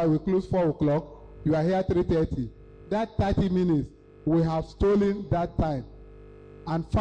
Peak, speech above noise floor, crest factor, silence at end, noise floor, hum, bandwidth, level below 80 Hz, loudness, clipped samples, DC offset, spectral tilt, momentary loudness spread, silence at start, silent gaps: -16 dBFS; 22 dB; 10 dB; 0 s; -47 dBFS; 50 Hz at -45 dBFS; 8.6 kHz; -40 dBFS; -26 LUFS; under 0.1%; under 0.1%; -9 dB/octave; 10 LU; 0 s; none